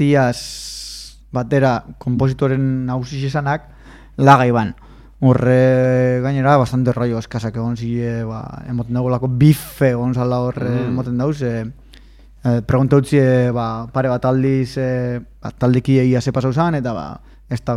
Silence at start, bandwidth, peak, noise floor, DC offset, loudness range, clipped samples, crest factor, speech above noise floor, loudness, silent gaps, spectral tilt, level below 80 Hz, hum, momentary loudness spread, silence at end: 0 s; 15 kHz; 0 dBFS; -43 dBFS; under 0.1%; 4 LU; under 0.1%; 16 dB; 27 dB; -17 LUFS; none; -7.5 dB/octave; -42 dBFS; none; 13 LU; 0 s